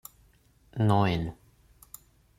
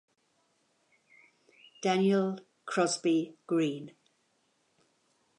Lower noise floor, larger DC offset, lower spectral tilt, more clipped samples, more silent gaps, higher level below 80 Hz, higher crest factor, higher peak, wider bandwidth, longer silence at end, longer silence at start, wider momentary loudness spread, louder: second, -62 dBFS vs -74 dBFS; neither; first, -7 dB/octave vs -5 dB/octave; neither; neither; first, -54 dBFS vs -88 dBFS; about the same, 20 dB vs 18 dB; about the same, -12 dBFS vs -14 dBFS; first, 16 kHz vs 11 kHz; second, 1.05 s vs 1.5 s; second, 0.75 s vs 1.8 s; first, 25 LU vs 14 LU; first, -27 LUFS vs -30 LUFS